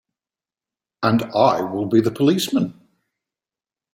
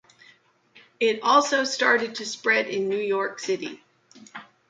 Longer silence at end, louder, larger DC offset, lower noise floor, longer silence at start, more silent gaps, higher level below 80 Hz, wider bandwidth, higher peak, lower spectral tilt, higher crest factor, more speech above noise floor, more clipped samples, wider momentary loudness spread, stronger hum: first, 1.2 s vs 0.25 s; first, -19 LUFS vs -23 LUFS; neither; first, under -90 dBFS vs -58 dBFS; about the same, 1 s vs 1 s; neither; first, -62 dBFS vs -78 dBFS; first, 16.5 kHz vs 9.4 kHz; first, -2 dBFS vs -6 dBFS; first, -6 dB/octave vs -2.5 dB/octave; about the same, 20 dB vs 20 dB; first, over 72 dB vs 34 dB; neither; second, 6 LU vs 16 LU; neither